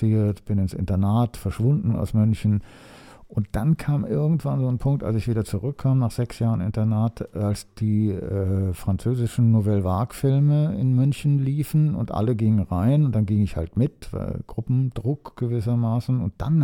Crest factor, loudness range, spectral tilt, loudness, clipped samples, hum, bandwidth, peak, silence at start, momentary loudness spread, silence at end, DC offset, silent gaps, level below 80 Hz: 14 dB; 3 LU; -9 dB/octave; -23 LUFS; under 0.1%; none; 16.5 kHz; -8 dBFS; 0 s; 7 LU; 0 s; under 0.1%; none; -42 dBFS